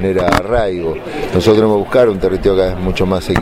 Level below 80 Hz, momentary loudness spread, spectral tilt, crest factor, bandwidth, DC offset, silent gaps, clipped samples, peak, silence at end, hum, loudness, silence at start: -28 dBFS; 7 LU; -6.5 dB/octave; 14 dB; 16 kHz; under 0.1%; none; under 0.1%; 0 dBFS; 0 s; none; -14 LUFS; 0 s